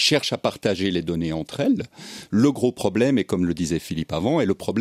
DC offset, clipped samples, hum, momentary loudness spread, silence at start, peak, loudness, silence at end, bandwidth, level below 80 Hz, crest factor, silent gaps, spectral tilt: under 0.1%; under 0.1%; none; 6 LU; 0 s; -6 dBFS; -23 LUFS; 0 s; 15.5 kHz; -50 dBFS; 18 dB; none; -5 dB/octave